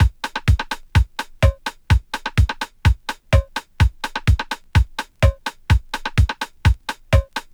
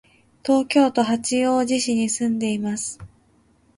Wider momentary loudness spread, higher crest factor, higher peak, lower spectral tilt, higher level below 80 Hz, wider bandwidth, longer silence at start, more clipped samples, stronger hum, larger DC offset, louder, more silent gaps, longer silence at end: second, 3 LU vs 11 LU; about the same, 16 dB vs 16 dB; first, -2 dBFS vs -6 dBFS; first, -5.5 dB/octave vs -3.5 dB/octave; first, -22 dBFS vs -58 dBFS; first, 16 kHz vs 11.5 kHz; second, 0 s vs 0.45 s; neither; neither; neither; about the same, -21 LUFS vs -21 LUFS; neither; second, 0.15 s vs 0.7 s